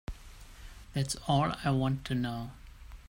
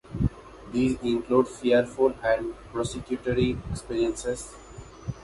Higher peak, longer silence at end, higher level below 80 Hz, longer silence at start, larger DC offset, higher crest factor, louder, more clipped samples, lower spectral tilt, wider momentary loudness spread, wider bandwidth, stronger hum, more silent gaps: second, -16 dBFS vs -8 dBFS; about the same, 0.05 s vs 0 s; about the same, -48 dBFS vs -44 dBFS; about the same, 0.1 s vs 0.05 s; neither; about the same, 18 dB vs 20 dB; second, -32 LUFS vs -27 LUFS; neither; about the same, -5.5 dB/octave vs -6 dB/octave; first, 23 LU vs 15 LU; first, 16 kHz vs 11.5 kHz; neither; neither